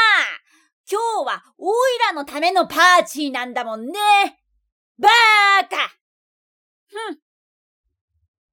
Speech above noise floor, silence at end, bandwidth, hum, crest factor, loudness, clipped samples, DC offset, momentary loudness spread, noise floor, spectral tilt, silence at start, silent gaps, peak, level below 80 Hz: over 73 dB; 1.4 s; 18.5 kHz; none; 16 dB; -17 LUFS; under 0.1%; under 0.1%; 16 LU; under -90 dBFS; -0.5 dB/octave; 0 s; 0.73-0.84 s, 4.72-4.95 s, 6.01-6.87 s; -4 dBFS; -70 dBFS